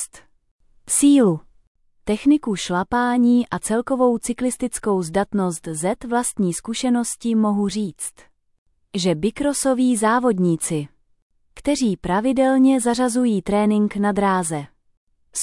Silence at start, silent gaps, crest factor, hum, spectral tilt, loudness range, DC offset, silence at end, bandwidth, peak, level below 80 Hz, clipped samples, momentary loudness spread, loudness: 0 s; 0.51-0.59 s, 1.67-1.75 s, 8.58-8.66 s, 11.22-11.30 s, 14.97-15.07 s; 14 dB; none; -5 dB/octave; 3 LU; under 0.1%; 0 s; 12 kHz; -6 dBFS; -50 dBFS; under 0.1%; 10 LU; -20 LUFS